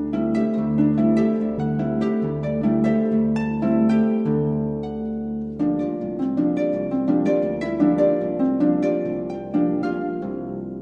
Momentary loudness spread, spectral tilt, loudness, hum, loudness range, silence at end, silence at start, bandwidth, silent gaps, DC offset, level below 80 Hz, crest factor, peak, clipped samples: 9 LU; -9.5 dB/octave; -22 LUFS; none; 2 LU; 0 s; 0 s; 6.4 kHz; none; under 0.1%; -48 dBFS; 14 dB; -6 dBFS; under 0.1%